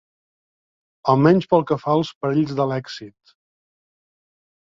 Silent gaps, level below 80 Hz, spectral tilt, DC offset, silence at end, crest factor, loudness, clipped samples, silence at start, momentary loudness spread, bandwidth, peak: 2.15-2.21 s; -60 dBFS; -8 dB/octave; under 0.1%; 1.7 s; 20 dB; -19 LUFS; under 0.1%; 1.05 s; 13 LU; 7.6 kHz; -2 dBFS